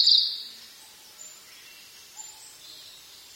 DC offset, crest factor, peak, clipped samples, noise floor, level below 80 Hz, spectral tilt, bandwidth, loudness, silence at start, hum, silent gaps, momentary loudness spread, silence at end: under 0.1%; 24 dB; -6 dBFS; under 0.1%; -50 dBFS; -78 dBFS; 2.5 dB/octave; 16.5 kHz; -21 LUFS; 0 s; none; none; 22 LU; 0.45 s